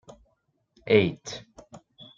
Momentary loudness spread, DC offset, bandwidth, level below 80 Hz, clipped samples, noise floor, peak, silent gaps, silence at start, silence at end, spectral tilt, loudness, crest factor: 25 LU; under 0.1%; 7.6 kHz; -64 dBFS; under 0.1%; -72 dBFS; -6 dBFS; none; 0.85 s; 0.4 s; -5.5 dB/octave; -23 LUFS; 24 dB